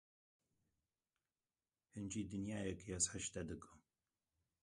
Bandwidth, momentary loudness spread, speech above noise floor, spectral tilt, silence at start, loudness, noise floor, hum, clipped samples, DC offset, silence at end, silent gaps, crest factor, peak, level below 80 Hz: 11.5 kHz; 15 LU; over 45 dB; -3.5 dB/octave; 1.95 s; -44 LUFS; under -90 dBFS; none; under 0.1%; under 0.1%; 0.85 s; none; 26 dB; -22 dBFS; -66 dBFS